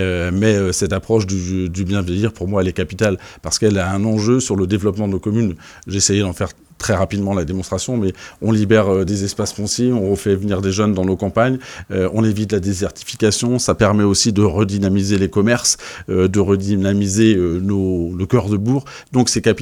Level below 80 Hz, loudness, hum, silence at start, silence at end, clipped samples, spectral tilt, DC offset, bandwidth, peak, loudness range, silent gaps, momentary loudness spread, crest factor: -40 dBFS; -17 LUFS; none; 0 s; 0 s; under 0.1%; -5 dB/octave; under 0.1%; 15.5 kHz; 0 dBFS; 3 LU; none; 7 LU; 16 dB